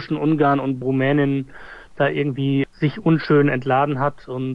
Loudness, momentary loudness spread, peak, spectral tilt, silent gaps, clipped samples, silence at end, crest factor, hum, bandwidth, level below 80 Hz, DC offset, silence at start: -20 LUFS; 9 LU; -6 dBFS; -9.5 dB/octave; none; under 0.1%; 0 s; 14 dB; none; 5.6 kHz; -52 dBFS; under 0.1%; 0 s